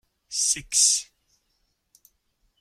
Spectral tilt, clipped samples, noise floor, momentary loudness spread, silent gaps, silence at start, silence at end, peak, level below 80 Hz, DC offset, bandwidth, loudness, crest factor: 2.5 dB/octave; under 0.1%; -73 dBFS; 8 LU; none; 0.3 s; 1.55 s; -6 dBFS; -62 dBFS; under 0.1%; 16.5 kHz; -21 LUFS; 24 dB